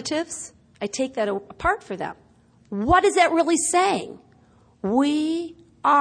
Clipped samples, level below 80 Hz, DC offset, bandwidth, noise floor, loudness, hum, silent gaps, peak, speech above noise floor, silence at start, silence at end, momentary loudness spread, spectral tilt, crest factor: under 0.1%; -48 dBFS; under 0.1%; 10.5 kHz; -56 dBFS; -22 LUFS; none; none; -6 dBFS; 34 dB; 0 s; 0 s; 16 LU; -3.5 dB/octave; 18 dB